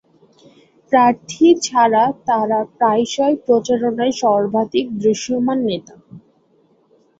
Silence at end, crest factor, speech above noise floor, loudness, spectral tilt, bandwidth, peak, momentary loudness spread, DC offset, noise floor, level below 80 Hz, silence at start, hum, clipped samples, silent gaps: 1 s; 16 dB; 41 dB; -17 LUFS; -4.5 dB/octave; 7.8 kHz; -2 dBFS; 5 LU; under 0.1%; -57 dBFS; -60 dBFS; 0.9 s; none; under 0.1%; none